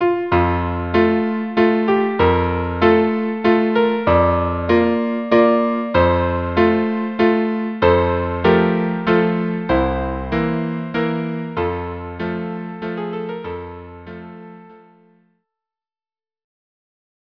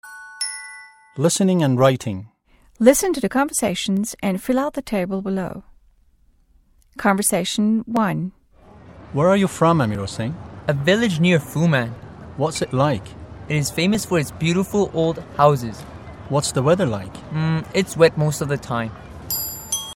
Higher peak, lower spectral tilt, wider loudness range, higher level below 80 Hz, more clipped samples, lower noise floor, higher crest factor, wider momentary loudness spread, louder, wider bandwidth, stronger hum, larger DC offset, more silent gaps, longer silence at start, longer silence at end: about the same, 0 dBFS vs 0 dBFS; first, -9 dB/octave vs -5 dB/octave; first, 13 LU vs 4 LU; first, -38 dBFS vs -48 dBFS; neither; first, under -90 dBFS vs -57 dBFS; about the same, 18 dB vs 20 dB; about the same, 12 LU vs 14 LU; about the same, -18 LUFS vs -20 LUFS; second, 5.4 kHz vs 17 kHz; neither; first, 0.2% vs under 0.1%; neither; about the same, 0 s vs 0.05 s; first, 2.55 s vs 0.05 s